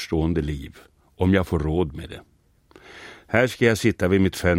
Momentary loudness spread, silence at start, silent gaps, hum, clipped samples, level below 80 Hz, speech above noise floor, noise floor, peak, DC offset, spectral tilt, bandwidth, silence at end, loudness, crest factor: 22 LU; 0 s; none; none; under 0.1%; -38 dBFS; 32 dB; -54 dBFS; -2 dBFS; under 0.1%; -6.5 dB/octave; 16.5 kHz; 0 s; -22 LUFS; 20 dB